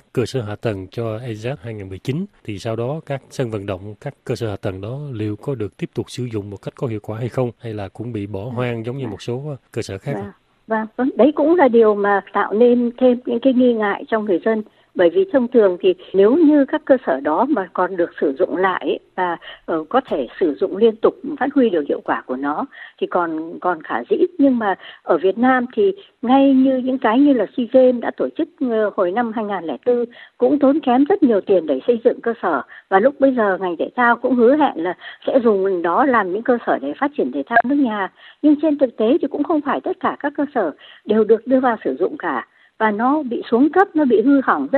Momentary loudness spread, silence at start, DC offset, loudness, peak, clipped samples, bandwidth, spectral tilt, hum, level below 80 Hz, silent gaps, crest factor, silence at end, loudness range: 12 LU; 0.15 s; under 0.1%; -18 LUFS; 0 dBFS; under 0.1%; 10 kHz; -7.5 dB/octave; none; -62 dBFS; none; 18 dB; 0 s; 10 LU